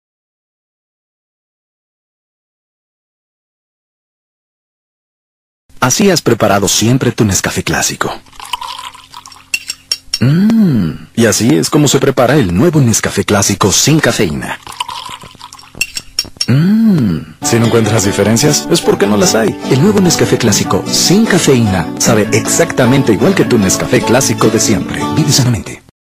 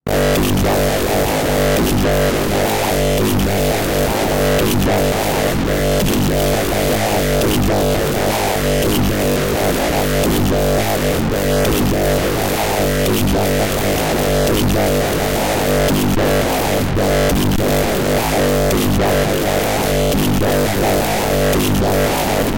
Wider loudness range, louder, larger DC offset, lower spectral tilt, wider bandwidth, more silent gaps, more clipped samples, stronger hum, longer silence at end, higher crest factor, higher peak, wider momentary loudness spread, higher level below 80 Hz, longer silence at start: first, 5 LU vs 0 LU; first, -11 LUFS vs -16 LUFS; neither; about the same, -4.5 dB/octave vs -5 dB/octave; about the same, 16 kHz vs 17.5 kHz; neither; neither; neither; first, 0.35 s vs 0 s; about the same, 12 dB vs 8 dB; first, 0 dBFS vs -6 dBFS; first, 10 LU vs 2 LU; second, -40 dBFS vs -26 dBFS; first, 5.75 s vs 0.05 s